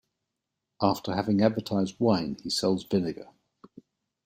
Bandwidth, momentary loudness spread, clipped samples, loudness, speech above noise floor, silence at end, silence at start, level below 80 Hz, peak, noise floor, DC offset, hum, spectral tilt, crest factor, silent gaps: 16 kHz; 5 LU; under 0.1%; -27 LUFS; 58 dB; 1 s; 0.8 s; -64 dBFS; -8 dBFS; -84 dBFS; under 0.1%; none; -6 dB/octave; 20 dB; none